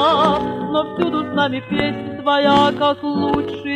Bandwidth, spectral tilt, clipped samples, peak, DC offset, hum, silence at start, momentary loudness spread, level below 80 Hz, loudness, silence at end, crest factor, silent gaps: 9.6 kHz; -6 dB/octave; under 0.1%; -2 dBFS; under 0.1%; none; 0 s; 7 LU; -46 dBFS; -18 LUFS; 0 s; 16 dB; none